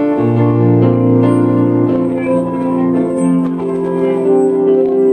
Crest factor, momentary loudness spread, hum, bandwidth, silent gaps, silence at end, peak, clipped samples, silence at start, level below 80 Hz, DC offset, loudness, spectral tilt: 12 dB; 4 LU; none; 9.2 kHz; none; 0 s; 0 dBFS; under 0.1%; 0 s; -52 dBFS; under 0.1%; -13 LUFS; -9.5 dB/octave